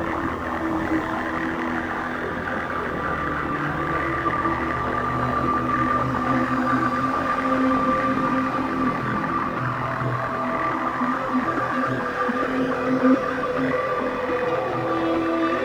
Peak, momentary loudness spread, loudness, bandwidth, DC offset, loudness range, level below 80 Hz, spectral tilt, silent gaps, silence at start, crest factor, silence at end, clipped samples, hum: -6 dBFS; 5 LU; -23 LUFS; over 20 kHz; under 0.1%; 4 LU; -44 dBFS; -7 dB/octave; none; 0 s; 16 dB; 0 s; under 0.1%; none